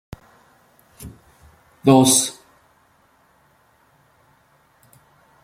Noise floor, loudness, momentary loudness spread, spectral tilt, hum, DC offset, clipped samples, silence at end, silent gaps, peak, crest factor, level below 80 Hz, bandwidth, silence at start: -58 dBFS; -16 LUFS; 30 LU; -4 dB/octave; none; under 0.1%; under 0.1%; 3.1 s; none; -2 dBFS; 22 dB; -56 dBFS; 16 kHz; 1 s